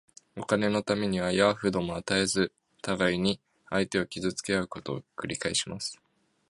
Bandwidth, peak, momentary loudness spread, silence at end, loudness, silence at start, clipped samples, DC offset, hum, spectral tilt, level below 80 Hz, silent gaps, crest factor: 11.5 kHz; -8 dBFS; 12 LU; 0.55 s; -29 LUFS; 0.35 s; under 0.1%; under 0.1%; none; -4 dB/octave; -58 dBFS; none; 22 dB